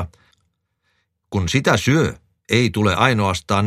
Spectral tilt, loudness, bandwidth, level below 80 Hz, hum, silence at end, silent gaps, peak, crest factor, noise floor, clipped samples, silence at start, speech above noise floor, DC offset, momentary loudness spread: -5 dB/octave; -18 LUFS; 15 kHz; -44 dBFS; none; 0 s; none; 0 dBFS; 18 dB; -69 dBFS; under 0.1%; 0 s; 52 dB; under 0.1%; 8 LU